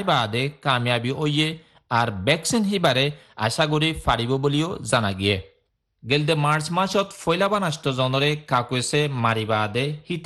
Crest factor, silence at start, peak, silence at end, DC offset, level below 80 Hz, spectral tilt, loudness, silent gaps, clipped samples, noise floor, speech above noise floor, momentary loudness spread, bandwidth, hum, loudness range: 18 dB; 0 s; -4 dBFS; 0 s; under 0.1%; -48 dBFS; -4.5 dB/octave; -22 LUFS; none; under 0.1%; -68 dBFS; 46 dB; 5 LU; 12.5 kHz; none; 1 LU